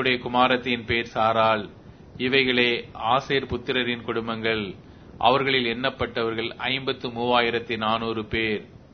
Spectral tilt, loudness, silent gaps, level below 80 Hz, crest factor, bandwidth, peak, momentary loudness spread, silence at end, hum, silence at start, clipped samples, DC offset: -6 dB/octave; -24 LUFS; none; -52 dBFS; 20 dB; 6.6 kHz; -4 dBFS; 8 LU; 0.2 s; none; 0 s; under 0.1%; under 0.1%